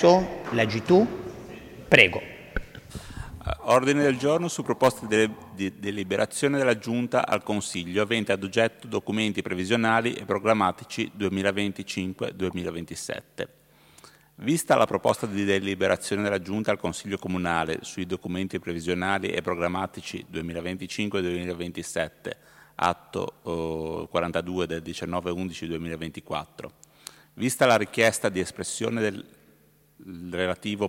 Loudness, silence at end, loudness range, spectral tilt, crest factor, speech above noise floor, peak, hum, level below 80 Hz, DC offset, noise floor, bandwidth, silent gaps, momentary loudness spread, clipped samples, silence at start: -26 LUFS; 0 s; 7 LU; -4.5 dB/octave; 26 dB; 34 dB; 0 dBFS; none; -52 dBFS; under 0.1%; -60 dBFS; 16.5 kHz; none; 15 LU; under 0.1%; 0 s